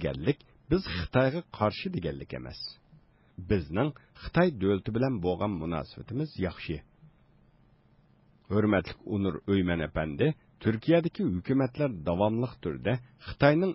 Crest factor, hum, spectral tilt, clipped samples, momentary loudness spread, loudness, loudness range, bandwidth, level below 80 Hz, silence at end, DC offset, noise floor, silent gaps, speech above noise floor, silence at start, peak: 20 dB; none; -11 dB/octave; under 0.1%; 12 LU; -30 LUFS; 5 LU; 5.8 kHz; -48 dBFS; 0 s; under 0.1%; -63 dBFS; none; 34 dB; 0 s; -10 dBFS